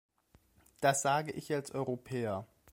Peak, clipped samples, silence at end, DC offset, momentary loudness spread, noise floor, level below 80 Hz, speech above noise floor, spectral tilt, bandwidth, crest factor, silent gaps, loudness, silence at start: -14 dBFS; under 0.1%; 0.25 s; under 0.1%; 8 LU; -68 dBFS; -70 dBFS; 35 dB; -4 dB/octave; 16 kHz; 20 dB; none; -34 LUFS; 0.8 s